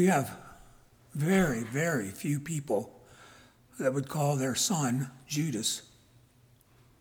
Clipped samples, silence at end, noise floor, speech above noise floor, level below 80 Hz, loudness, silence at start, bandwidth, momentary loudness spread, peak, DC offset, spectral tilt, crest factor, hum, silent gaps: under 0.1%; 1.15 s; -62 dBFS; 33 dB; -60 dBFS; -30 LUFS; 0 s; over 20 kHz; 9 LU; -14 dBFS; under 0.1%; -4.5 dB/octave; 18 dB; none; none